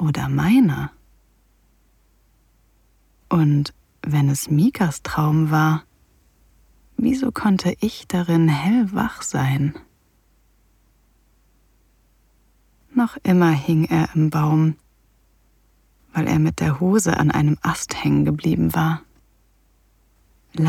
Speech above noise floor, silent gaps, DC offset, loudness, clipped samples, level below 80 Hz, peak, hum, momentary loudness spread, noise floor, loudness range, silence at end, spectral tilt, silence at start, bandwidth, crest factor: 41 dB; none; under 0.1%; -20 LUFS; under 0.1%; -48 dBFS; -4 dBFS; none; 8 LU; -60 dBFS; 6 LU; 0 s; -6.5 dB/octave; 0 s; 16 kHz; 16 dB